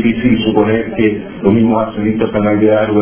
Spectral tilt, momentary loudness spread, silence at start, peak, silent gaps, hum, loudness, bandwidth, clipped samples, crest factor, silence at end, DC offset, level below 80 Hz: -11 dB/octave; 4 LU; 0 s; 0 dBFS; none; none; -13 LUFS; 3.5 kHz; under 0.1%; 12 dB; 0 s; under 0.1%; -38 dBFS